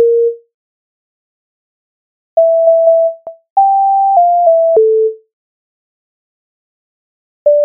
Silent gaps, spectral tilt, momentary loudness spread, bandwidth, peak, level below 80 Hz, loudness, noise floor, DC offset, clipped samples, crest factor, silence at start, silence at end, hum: 0.54-2.37 s, 3.50-3.56 s, 5.33-7.46 s; -1 dB/octave; 8 LU; 1.2 kHz; 0 dBFS; -72 dBFS; -11 LUFS; under -90 dBFS; under 0.1%; under 0.1%; 12 dB; 0 s; 0 s; none